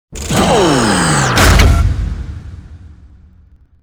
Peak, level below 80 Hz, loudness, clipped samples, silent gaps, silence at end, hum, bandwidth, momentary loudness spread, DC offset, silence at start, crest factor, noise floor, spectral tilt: 0 dBFS; -18 dBFS; -11 LUFS; under 0.1%; none; 0.9 s; none; over 20 kHz; 19 LU; under 0.1%; 0.1 s; 14 dB; -45 dBFS; -4.5 dB/octave